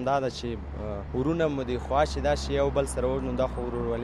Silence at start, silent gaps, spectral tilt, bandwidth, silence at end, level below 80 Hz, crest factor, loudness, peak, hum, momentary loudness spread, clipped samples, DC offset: 0 s; none; -6 dB/octave; 12.5 kHz; 0 s; -36 dBFS; 18 dB; -28 LUFS; -10 dBFS; none; 9 LU; under 0.1%; under 0.1%